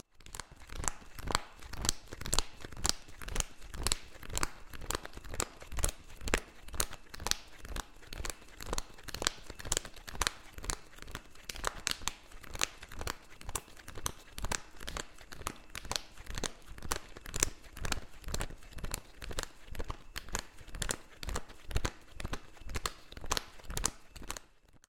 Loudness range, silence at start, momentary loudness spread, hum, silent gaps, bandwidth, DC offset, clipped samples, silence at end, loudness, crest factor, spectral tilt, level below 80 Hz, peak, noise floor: 5 LU; 0.15 s; 12 LU; none; none; 17 kHz; under 0.1%; under 0.1%; 0.1 s; -39 LUFS; 34 dB; -2 dB/octave; -44 dBFS; -4 dBFS; -59 dBFS